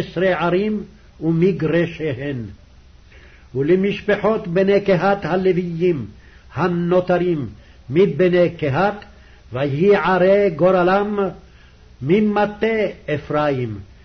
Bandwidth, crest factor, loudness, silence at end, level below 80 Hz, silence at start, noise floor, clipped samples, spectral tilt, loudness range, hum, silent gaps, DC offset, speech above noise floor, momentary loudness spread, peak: 6.4 kHz; 14 dB; -18 LUFS; 0.2 s; -46 dBFS; 0 s; -46 dBFS; under 0.1%; -8.5 dB/octave; 4 LU; none; none; under 0.1%; 28 dB; 12 LU; -6 dBFS